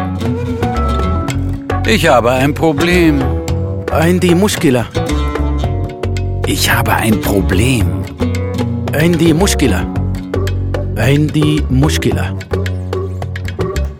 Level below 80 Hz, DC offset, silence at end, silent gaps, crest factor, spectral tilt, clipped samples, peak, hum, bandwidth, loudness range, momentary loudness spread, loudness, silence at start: -24 dBFS; under 0.1%; 0 s; none; 14 dB; -5.5 dB/octave; under 0.1%; 0 dBFS; none; 17 kHz; 3 LU; 8 LU; -14 LUFS; 0 s